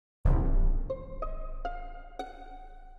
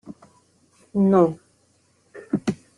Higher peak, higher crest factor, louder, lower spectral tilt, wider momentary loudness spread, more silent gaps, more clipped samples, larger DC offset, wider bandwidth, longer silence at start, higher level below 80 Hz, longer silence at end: second, -14 dBFS vs -4 dBFS; about the same, 16 dB vs 20 dB; second, -35 LUFS vs -21 LUFS; about the same, -9 dB/octave vs -8.5 dB/octave; second, 17 LU vs 21 LU; neither; neither; neither; second, 4 kHz vs 11 kHz; first, 0.25 s vs 0.05 s; first, -30 dBFS vs -62 dBFS; second, 0 s vs 0.2 s